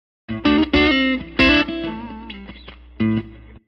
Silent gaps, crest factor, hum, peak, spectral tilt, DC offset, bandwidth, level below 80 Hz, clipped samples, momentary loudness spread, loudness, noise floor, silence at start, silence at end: none; 18 dB; none; -2 dBFS; -6.5 dB/octave; under 0.1%; 6.6 kHz; -36 dBFS; under 0.1%; 20 LU; -18 LUFS; -40 dBFS; 0.3 s; 0.25 s